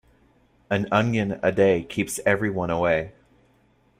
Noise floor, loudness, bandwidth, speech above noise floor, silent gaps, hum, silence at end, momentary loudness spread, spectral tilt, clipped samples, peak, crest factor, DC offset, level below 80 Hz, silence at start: -61 dBFS; -23 LUFS; 16 kHz; 39 dB; none; none; 0.9 s; 7 LU; -5.5 dB/octave; under 0.1%; -6 dBFS; 18 dB; under 0.1%; -54 dBFS; 0.7 s